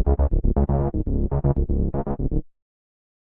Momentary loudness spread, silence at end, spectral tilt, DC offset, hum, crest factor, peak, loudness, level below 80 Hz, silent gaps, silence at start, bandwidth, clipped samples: 5 LU; 0.85 s; -13.5 dB/octave; under 0.1%; none; 14 dB; -8 dBFS; -24 LUFS; -24 dBFS; none; 0 s; 2.1 kHz; under 0.1%